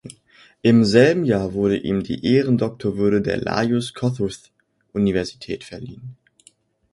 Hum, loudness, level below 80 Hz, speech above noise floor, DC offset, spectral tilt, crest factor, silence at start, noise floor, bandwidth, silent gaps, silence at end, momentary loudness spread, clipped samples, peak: none; -20 LUFS; -48 dBFS; 37 dB; under 0.1%; -6.5 dB/octave; 20 dB; 0.05 s; -56 dBFS; 11.5 kHz; none; 0.8 s; 18 LU; under 0.1%; 0 dBFS